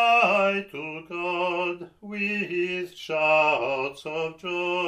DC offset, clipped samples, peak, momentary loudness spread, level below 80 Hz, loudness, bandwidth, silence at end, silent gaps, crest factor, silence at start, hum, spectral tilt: under 0.1%; under 0.1%; -8 dBFS; 13 LU; -68 dBFS; -25 LUFS; 14 kHz; 0 s; none; 18 dB; 0 s; none; -5 dB/octave